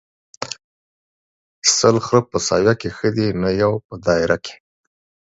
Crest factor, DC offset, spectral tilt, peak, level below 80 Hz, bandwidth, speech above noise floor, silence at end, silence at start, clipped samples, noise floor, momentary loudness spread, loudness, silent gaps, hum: 20 dB; under 0.1%; -4 dB/octave; 0 dBFS; -48 dBFS; 8.2 kHz; over 72 dB; 0.85 s; 0.4 s; under 0.1%; under -90 dBFS; 16 LU; -18 LUFS; 0.64-1.62 s, 3.85-3.89 s; none